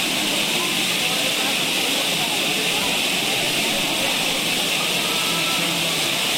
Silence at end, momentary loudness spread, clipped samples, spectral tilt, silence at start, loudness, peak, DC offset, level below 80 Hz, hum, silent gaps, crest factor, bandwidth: 0 s; 0 LU; under 0.1%; -1 dB/octave; 0 s; -19 LUFS; -8 dBFS; under 0.1%; -54 dBFS; none; none; 14 dB; 16.5 kHz